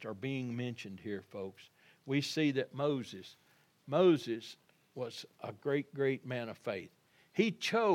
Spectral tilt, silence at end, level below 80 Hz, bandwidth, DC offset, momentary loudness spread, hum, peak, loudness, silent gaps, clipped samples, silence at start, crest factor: -6 dB/octave; 0 s; -88 dBFS; 16 kHz; under 0.1%; 17 LU; none; -16 dBFS; -36 LUFS; none; under 0.1%; 0 s; 20 dB